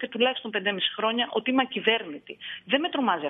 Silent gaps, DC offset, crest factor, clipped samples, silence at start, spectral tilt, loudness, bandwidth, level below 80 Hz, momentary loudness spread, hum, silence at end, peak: none; under 0.1%; 20 dB; under 0.1%; 0 s; -7 dB/octave; -26 LUFS; 4 kHz; -78 dBFS; 13 LU; none; 0 s; -8 dBFS